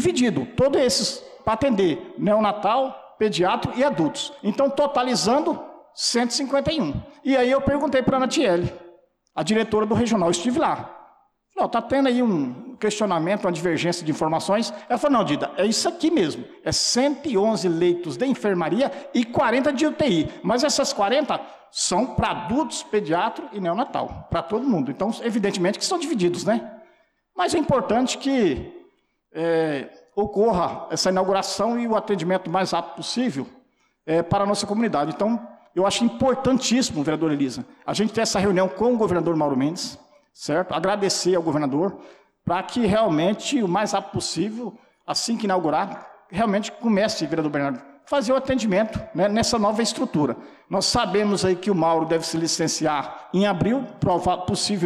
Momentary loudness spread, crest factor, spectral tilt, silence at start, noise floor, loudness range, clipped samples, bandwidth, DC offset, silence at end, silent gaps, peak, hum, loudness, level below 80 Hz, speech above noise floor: 7 LU; 10 dB; -4.5 dB/octave; 0 s; -61 dBFS; 3 LU; under 0.1%; 14 kHz; under 0.1%; 0 s; none; -12 dBFS; none; -22 LUFS; -50 dBFS; 39 dB